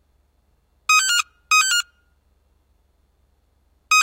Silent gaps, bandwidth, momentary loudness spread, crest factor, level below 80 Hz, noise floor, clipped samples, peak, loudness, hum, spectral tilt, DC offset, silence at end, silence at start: none; 16 kHz; 11 LU; 18 dB; -62 dBFS; -63 dBFS; under 0.1%; -6 dBFS; -17 LUFS; 50 Hz at -65 dBFS; 5.5 dB/octave; under 0.1%; 0 s; 0.9 s